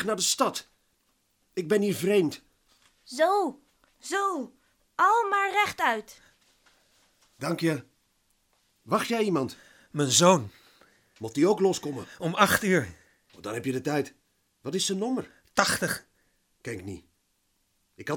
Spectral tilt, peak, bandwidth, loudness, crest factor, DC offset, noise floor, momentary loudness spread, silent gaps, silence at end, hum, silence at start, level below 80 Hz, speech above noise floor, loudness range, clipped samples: -3.5 dB/octave; -4 dBFS; 19 kHz; -26 LUFS; 26 dB; under 0.1%; -73 dBFS; 17 LU; none; 0 s; none; 0 s; -66 dBFS; 46 dB; 6 LU; under 0.1%